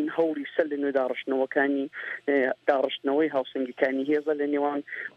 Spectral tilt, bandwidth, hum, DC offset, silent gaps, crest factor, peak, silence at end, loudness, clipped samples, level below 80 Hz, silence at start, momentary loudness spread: -6.5 dB/octave; 6 kHz; none; under 0.1%; none; 20 dB; -8 dBFS; 0.1 s; -27 LUFS; under 0.1%; -80 dBFS; 0 s; 5 LU